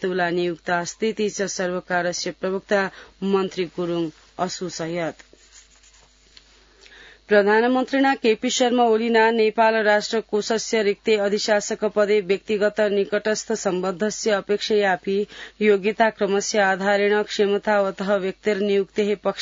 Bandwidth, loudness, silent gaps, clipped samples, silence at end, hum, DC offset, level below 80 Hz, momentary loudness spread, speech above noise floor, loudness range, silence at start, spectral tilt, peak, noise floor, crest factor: 7.8 kHz; -21 LUFS; none; under 0.1%; 0 s; none; under 0.1%; -60 dBFS; 9 LU; 33 dB; 8 LU; 0 s; -4 dB/octave; -6 dBFS; -54 dBFS; 16 dB